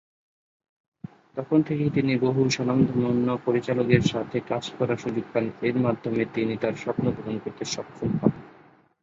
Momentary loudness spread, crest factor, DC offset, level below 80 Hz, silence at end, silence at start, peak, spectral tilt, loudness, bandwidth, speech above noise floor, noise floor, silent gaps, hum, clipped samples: 9 LU; 22 dB; under 0.1%; -56 dBFS; 0.55 s; 1.35 s; -4 dBFS; -6.5 dB/octave; -25 LUFS; 7.8 kHz; 31 dB; -55 dBFS; none; none; under 0.1%